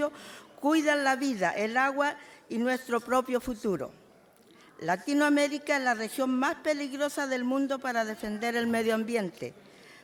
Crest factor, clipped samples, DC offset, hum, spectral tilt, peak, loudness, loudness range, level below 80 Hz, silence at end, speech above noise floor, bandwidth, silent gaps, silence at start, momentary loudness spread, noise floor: 16 dB; under 0.1%; under 0.1%; none; -4 dB/octave; -14 dBFS; -29 LUFS; 2 LU; -64 dBFS; 0.1 s; 29 dB; 17 kHz; none; 0 s; 10 LU; -58 dBFS